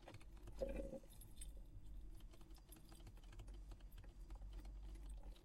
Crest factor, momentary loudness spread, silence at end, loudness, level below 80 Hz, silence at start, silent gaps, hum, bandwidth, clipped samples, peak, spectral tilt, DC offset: 22 dB; 12 LU; 0 s; -58 LUFS; -56 dBFS; 0 s; none; none; 15.5 kHz; under 0.1%; -32 dBFS; -5.5 dB/octave; under 0.1%